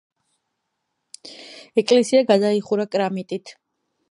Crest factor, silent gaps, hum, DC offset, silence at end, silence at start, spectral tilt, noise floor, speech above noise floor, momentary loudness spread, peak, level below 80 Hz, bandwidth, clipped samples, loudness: 20 dB; none; none; under 0.1%; 0.6 s; 1.25 s; -5 dB/octave; -77 dBFS; 58 dB; 23 LU; -4 dBFS; -76 dBFS; 11 kHz; under 0.1%; -20 LUFS